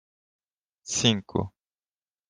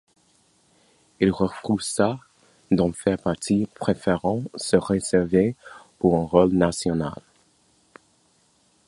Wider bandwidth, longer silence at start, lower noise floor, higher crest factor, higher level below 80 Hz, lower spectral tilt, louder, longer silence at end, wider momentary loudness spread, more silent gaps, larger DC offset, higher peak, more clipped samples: about the same, 10.5 kHz vs 11.5 kHz; second, 0.85 s vs 1.2 s; first, under -90 dBFS vs -63 dBFS; about the same, 24 dB vs 22 dB; second, -62 dBFS vs -50 dBFS; second, -3.5 dB/octave vs -6 dB/octave; second, -26 LUFS vs -23 LUFS; second, 0.8 s vs 1.75 s; first, 17 LU vs 8 LU; neither; neither; second, -6 dBFS vs -2 dBFS; neither